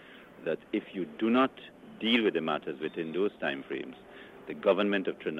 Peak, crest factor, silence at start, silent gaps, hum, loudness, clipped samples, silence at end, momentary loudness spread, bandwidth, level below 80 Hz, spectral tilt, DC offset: -12 dBFS; 18 dB; 0 s; none; none; -31 LUFS; under 0.1%; 0 s; 21 LU; 7.2 kHz; -72 dBFS; -6.5 dB/octave; under 0.1%